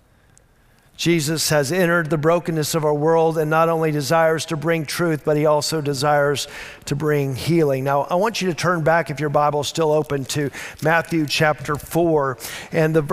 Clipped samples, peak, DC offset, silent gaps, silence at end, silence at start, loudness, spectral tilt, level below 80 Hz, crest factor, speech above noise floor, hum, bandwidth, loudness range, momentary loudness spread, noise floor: under 0.1%; -4 dBFS; under 0.1%; none; 0 s; 1 s; -20 LUFS; -5 dB/octave; -52 dBFS; 16 dB; 35 dB; none; 16 kHz; 2 LU; 6 LU; -55 dBFS